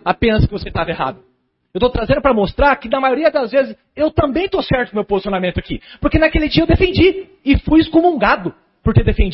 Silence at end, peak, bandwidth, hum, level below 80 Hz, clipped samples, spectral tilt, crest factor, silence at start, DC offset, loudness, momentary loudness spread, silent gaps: 0 s; 0 dBFS; 5.8 kHz; none; -26 dBFS; under 0.1%; -11.5 dB/octave; 14 dB; 0.05 s; under 0.1%; -16 LUFS; 9 LU; none